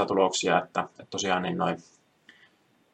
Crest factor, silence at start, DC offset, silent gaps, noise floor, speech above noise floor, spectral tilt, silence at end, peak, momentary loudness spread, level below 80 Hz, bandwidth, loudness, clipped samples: 22 dB; 0 s; under 0.1%; none; -63 dBFS; 36 dB; -3.5 dB/octave; 1.1 s; -8 dBFS; 9 LU; -72 dBFS; 10 kHz; -27 LUFS; under 0.1%